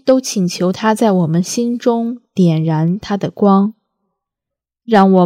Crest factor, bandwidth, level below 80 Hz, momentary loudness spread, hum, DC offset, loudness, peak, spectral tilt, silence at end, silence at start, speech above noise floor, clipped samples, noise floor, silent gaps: 14 dB; 15 kHz; -58 dBFS; 7 LU; none; under 0.1%; -15 LUFS; 0 dBFS; -6.5 dB/octave; 0 s; 0.05 s; 70 dB; under 0.1%; -83 dBFS; none